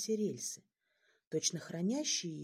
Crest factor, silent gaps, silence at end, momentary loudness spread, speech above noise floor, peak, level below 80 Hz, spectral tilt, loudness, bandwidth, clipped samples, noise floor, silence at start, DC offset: 18 dB; 1.27-1.31 s; 0 s; 8 LU; 39 dB; -20 dBFS; -86 dBFS; -3.5 dB/octave; -37 LUFS; 15.5 kHz; under 0.1%; -76 dBFS; 0 s; under 0.1%